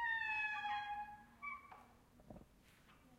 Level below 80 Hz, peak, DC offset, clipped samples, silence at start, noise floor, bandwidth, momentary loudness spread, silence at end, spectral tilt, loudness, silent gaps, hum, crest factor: -72 dBFS; -32 dBFS; under 0.1%; under 0.1%; 0 s; -68 dBFS; 16 kHz; 22 LU; 0.05 s; -3 dB/octave; -43 LUFS; none; none; 16 dB